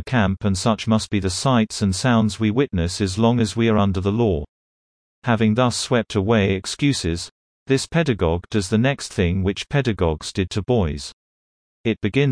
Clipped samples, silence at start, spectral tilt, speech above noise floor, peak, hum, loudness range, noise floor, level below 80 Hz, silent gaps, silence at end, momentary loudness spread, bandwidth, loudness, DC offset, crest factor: under 0.1%; 0 s; -5.5 dB/octave; over 70 dB; -4 dBFS; none; 3 LU; under -90 dBFS; -40 dBFS; 4.48-5.22 s, 7.31-7.66 s, 11.13-11.84 s; 0 s; 7 LU; 10.5 kHz; -21 LUFS; under 0.1%; 16 dB